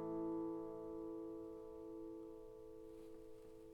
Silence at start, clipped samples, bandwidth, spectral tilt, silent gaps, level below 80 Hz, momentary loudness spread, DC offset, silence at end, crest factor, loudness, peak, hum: 0 s; under 0.1%; 12 kHz; -8.5 dB/octave; none; -70 dBFS; 13 LU; under 0.1%; 0 s; 14 dB; -51 LUFS; -36 dBFS; none